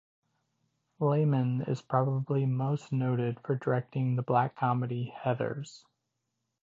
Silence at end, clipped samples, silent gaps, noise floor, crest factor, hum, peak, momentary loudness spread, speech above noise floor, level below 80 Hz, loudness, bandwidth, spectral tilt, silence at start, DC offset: 0.85 s; under 0.1%; none; -83 dBFS; 18 dB; none; -14 dBFS; 6 LU; 53 dB; -72 dBFS; -30 LUFS; 7.6 kHz; -9 dB/octave; 1 s; under 0.1%